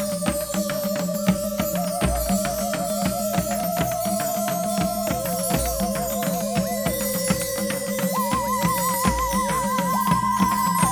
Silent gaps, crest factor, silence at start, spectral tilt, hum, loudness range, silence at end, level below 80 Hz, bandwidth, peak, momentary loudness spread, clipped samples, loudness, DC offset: none; 18 dB; 0 s; -4.5 dB/octave; none; 2 LU; 0 s; -38 dBFS; over 20 kHz; -6 dBFS; 4 LU; under 0.1%; -23 LUFS; under 0.1%